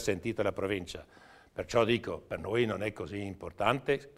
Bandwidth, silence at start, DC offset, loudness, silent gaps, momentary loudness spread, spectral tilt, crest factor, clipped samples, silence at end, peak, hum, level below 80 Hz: 15 kHz; 0 s; under 0.1%; -33 LUFS; none; 13 LU; -5.5 dB/octave; 22 dB; under 0.1%; 0.1 s; -10 dBFS; none; -58 dBFS